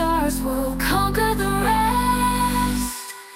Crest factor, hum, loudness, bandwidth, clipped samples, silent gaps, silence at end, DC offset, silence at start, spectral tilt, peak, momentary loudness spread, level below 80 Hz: 14 dB; none; -21 LUFS; 17 kHz; under 0.1%; none; 0 s; under 0.1%; 0 s; -4.5 dB/octave; -8 dBFS; 5 LU; -30 dBFS